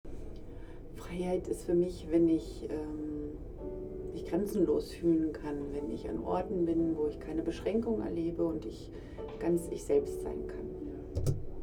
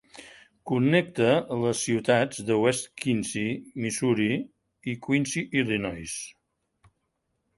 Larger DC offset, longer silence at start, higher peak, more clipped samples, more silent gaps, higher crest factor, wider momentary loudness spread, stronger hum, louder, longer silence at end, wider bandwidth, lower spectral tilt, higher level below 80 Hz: neither; about the same, 0.05 s vs 0.15 s; second, -18 dBFS vs -8 dBFS; neither; neither; about the same, 16 dB vs 20 dB; about the same, 14 LU vs 13 LU; neither; second, -34 LUFS vs -26 LUFS; second, 0 s vs 1.3 s; first, 15 kHz vs 11.5 kHz; first, -7.5 dB/octave vs -5 dB/octave; first, -48 dBFS vs -60 dBFS